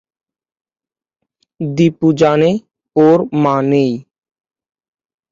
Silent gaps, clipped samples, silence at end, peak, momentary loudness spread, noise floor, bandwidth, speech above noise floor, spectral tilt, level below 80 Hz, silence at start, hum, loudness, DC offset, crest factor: none; under 0.1%; 1.3 s; 0 dBFS; 11 LU; under -90 dBFS; 7.6 kHz; over 78 dB; -7.5 dB/octave; -56 dBFS; 1.6 s; none; -14 LUFS; under 0.1%; 16 dB